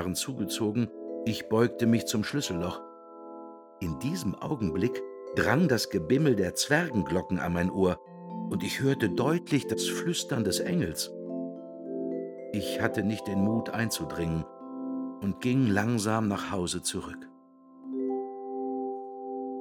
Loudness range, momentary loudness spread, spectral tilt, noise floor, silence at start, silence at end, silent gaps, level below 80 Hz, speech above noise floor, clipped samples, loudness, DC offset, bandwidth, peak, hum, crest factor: 4 LU; 13 LU; -5 dB/octave; -55 dBFS; 0 s; 0 s; none; -56 dBFS; 27 dB; under 0.1%; -30 LUFS; under 0.1%; 19 kHz; -8 dBFS; none; 22 dB